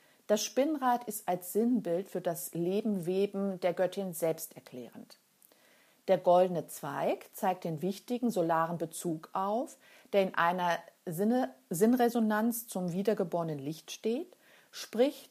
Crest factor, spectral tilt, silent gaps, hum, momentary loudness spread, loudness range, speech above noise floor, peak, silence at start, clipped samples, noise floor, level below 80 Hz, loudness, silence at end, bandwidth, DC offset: 20 dB; -5 dB/octave; none; none; 11 LU; 3 LU; 33 dB; -12 dBFS; 0.3 s; under 0.1%; -65 dBFS; -86 dBFS; -32 LUFS; 0.05 s; 15.5 kHz; under 0.1%